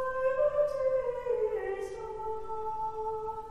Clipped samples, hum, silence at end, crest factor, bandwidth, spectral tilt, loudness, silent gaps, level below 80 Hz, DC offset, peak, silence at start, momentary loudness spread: under 0.1%; none; 0 s; 14 dB; 10.5 kHz; -5.5 dB/octave; -32 LUFS; none; -54 dBFS; under 0.1%; -18 dBFS; 0 s; 9 LU